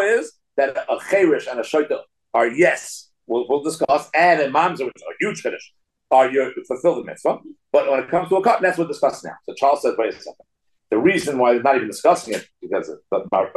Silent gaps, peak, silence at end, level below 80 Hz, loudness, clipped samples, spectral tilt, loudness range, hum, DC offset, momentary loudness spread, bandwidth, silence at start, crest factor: none; -4 dBFS; 0.05 s; -68 dBFS; -20 LUFS; under 0.1%; -4.5 dB/octave; 2 LU; none; under 0.1%; 12 LU; 12.5 kHz; 0 s; 16 dB